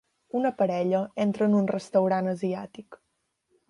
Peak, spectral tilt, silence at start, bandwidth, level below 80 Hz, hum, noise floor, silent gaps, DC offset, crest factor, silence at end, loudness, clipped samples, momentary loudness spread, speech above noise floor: -10 dBFS; -8 dB/octave; 0.35 s; 11 kHz; -72 dBFS; none; -75 dBFS; none; under 0.1%; 16 dB; 0.75 s; -26 LUFS; under 0.1%; 10 LU; 49 dB